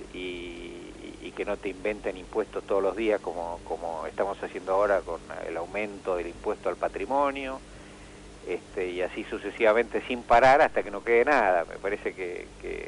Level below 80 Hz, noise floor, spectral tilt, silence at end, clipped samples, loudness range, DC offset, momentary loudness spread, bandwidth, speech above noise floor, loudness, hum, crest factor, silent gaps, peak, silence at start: -50 dBFS; -47 dBFS; -5 dB/octave; 0 s; under 0.1%; 8 LU; under 0.1%; 18 LU; 11 kHz; 19 dB; -28 LUFS; 50 Hz at -55 dBFS; 18 dB; none; -10 dBFS; 0 s